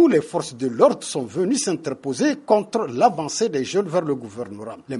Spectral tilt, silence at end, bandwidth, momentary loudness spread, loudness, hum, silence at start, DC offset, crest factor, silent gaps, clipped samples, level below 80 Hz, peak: -4.5 dB/octave; 0 s; 11.5 kHz; 10 LU; -21 LUFS; none; 0 s; under 0.1%; 20 dB; none; under 0.1%; -66 dBFS; -2 dBFS